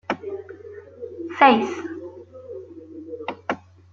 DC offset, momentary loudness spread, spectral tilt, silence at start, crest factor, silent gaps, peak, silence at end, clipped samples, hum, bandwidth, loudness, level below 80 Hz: under 0.1%; 24 LU; -5 dB/octave; 0.1 s; 24 dB; none; -2 dBFS; 0.35 s; under 0.1%; none; 7.4 kHz; -22 LUFS; -72 dBFS